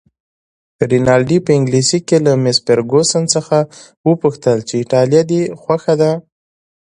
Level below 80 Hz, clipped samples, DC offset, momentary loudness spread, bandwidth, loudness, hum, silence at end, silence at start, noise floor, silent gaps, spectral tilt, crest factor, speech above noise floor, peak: -50 dBFS; under 0.1%; under 0.1%; 6 LU; 11 kHz; -14 LUFS; none; 0.65 s; 0.8 s; under -90 dBFS; 3.97-4.04 s; -5 dB/octave; 14 dB; over 77 dB; 0 dBFS